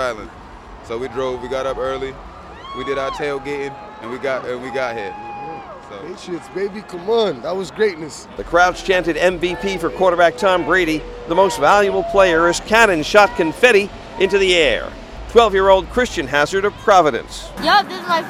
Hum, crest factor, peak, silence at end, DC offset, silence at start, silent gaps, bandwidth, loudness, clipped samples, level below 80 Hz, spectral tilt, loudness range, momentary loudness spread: none; 18 dB; 0 dBFS; 0 s; under 0.1%; 0 s; none; 16 kHz; -17 LUFS; under 0.1%; -40 dBFS; -4 dB/octave; 11 LU; 18 LU